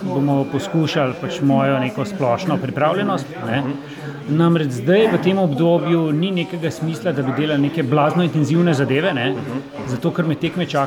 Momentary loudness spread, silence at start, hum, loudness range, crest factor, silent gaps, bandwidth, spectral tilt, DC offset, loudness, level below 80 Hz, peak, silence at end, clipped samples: 7 LU; 0 s; none; 2 LU; 14 dB; none; 13 kHz; -7 dB/octave; under 0.1%; -19 LUFS; -58 dBFS; -4 dBFS; 0 s; under 0.1%